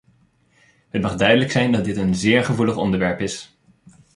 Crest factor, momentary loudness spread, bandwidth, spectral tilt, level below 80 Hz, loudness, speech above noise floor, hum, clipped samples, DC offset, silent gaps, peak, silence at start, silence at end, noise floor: 18 dB; 10 LU; 11.5 kHz; -5.5 dB/octave; -48 dBFS; -19 LUFS; 40 dB; none; under 0.1%; under 0.1%; none; -2 dBFS; 0.95 s; 0.7 s; -59 dBFS